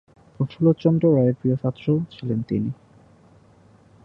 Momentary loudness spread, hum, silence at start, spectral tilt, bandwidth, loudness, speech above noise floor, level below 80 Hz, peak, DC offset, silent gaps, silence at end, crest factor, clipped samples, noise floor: 11 LU; none; 0.4 s; -11 dB/octave; 5.8 kHz; -22 LUFS; 32 dB; -56 dBFS; -6 dBFS; under 0.1%; none; 1.3 s; 18 dB; under 0.1%; -53 dBFS